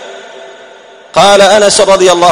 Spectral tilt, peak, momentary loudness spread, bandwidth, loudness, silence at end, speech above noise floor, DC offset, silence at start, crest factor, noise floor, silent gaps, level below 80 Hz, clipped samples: -2.5 dB/octave; 0 dBFS; 9 LU; 17 kHz; -6 LUFS; 0 s; 29 dB; under 0.1%; 0 s; 8 dB; -34 dBFS; none; -42 dBFS; 4%